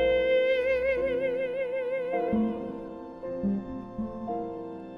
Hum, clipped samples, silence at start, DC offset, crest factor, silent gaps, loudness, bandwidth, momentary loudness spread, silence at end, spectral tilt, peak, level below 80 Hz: none; under 0.1%; 0 s; under 0.1%; 12 dB; none; -29 LUFS; 5.4 kHz; 14 LU; 0 s; -7.5 dB/octave; -16 dBFS; -52 dBFS